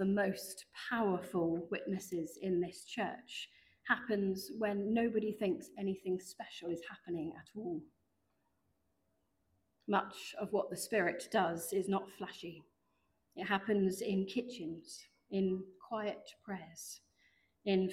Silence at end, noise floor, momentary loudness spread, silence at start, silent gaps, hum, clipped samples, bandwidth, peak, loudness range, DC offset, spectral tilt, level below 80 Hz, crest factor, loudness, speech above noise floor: 0 s; -81 dBFS; 14 LU; 0 s; none; none; under 0.1%; 16 kHz; -16 dBFS; 6 LU; under 0.1%; -5 dB/octave; -74 dBFS; 22 dB; -38 LUFS; 43 dB